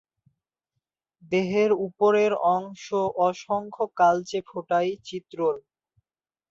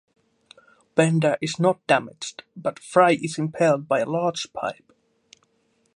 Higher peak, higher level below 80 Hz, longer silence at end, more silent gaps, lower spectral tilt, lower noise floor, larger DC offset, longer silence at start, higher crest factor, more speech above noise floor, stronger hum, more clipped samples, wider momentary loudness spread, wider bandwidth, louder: second, -8 dBFS vs -2 dBFS; about the same, -70 dBFS vs -70 dBFS; second, 0.9 s vs 1.25 s; neither; about the same, -5.5 dB/octave vs -5.5 dB/octave; first, under -90 dBFS vs -67 dBFS; neither; first, 1.3 s vs 0.95 s; about the same, 18 dB vs 22 dB; first, over 66 dB vs 45 dB; neither; neither; about the same, 10 LU vs 12 LU; second, 7.6 kHz vs 11.5 kHz; second, -25 LUFS vs -22 LUFS